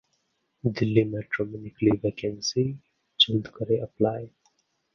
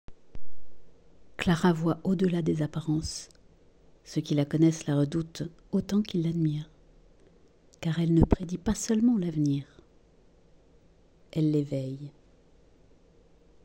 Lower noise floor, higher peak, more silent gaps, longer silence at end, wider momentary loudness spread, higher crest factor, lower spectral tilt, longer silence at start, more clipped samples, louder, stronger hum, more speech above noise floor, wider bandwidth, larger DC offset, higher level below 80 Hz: first, -74 dBFS vs -59 dBFS; about the same, -4 dBFS vs -6 dBFS; neither; second, 0.65 s vs 1.55 s; about the same, 13 LU vs 13 LU; about the same, 24 dB vs 22 dB; second, -5 dB/octave vs -6.5 dB/octave; first, 0.65 s vs 0.1 s; neither; about the same, -26 LUFS vs -28 LUFS; neither; first, 48 dB vs 32 dB; second, 7.2 kHz vs 16 kHz; neither; second, -56 dBFS vs -46 dBFS